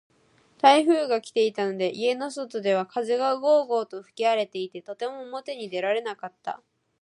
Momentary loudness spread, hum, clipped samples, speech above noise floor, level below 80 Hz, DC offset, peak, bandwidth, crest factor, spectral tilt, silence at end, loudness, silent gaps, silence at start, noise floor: 15 LU; none; under 0.1%; 36 dB; -82 dBFS; under 0.1%; -4 dBFS; 11 kHz; 20 dB; -4 dB/octave; 0.45 s; -25 LUFS; none; 0.65 s; -61 dBFS